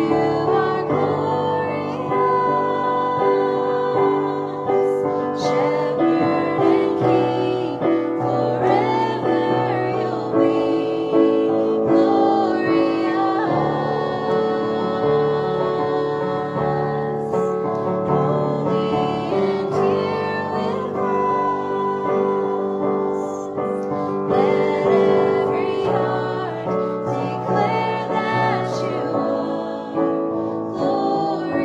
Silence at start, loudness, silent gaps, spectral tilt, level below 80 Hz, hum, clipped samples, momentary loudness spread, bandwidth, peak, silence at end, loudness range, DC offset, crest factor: 0 s; -20 LUFS; none; -7.5 dB/octave; -56 dBFS; none; under 0.1%; 6 LU; 8 kHz; -4 dBFS; 0 s; 3 LU; under 0.1%; 16 dB